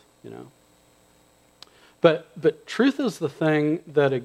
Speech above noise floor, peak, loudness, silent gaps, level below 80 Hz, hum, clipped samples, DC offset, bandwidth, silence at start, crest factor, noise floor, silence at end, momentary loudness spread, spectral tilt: 36 dB; -2 dBFS; -23 LUFS; none; -70 dBFS; 60 Hz at -55 dBFS; under 0.1%; under 0.1%; 13.5 kHz; 0.25 s; 22 dB; -59 dBFS; 0 s; 22 LU; -6.5 dB/octave